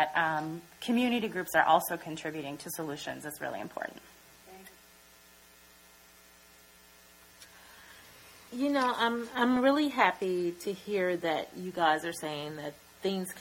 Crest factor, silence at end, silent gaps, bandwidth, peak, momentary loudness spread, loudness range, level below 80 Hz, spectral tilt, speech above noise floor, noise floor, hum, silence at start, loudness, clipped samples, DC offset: 24 dB; 0 s; none; 16.5 kHz; -8 dBFS; 25 LU; 14 LU; -70 dBFS; -4 dB/octave; 27 dB; -58 dBFS; none; 0 s; -31 LUFS; under 0.1%; under 0.1%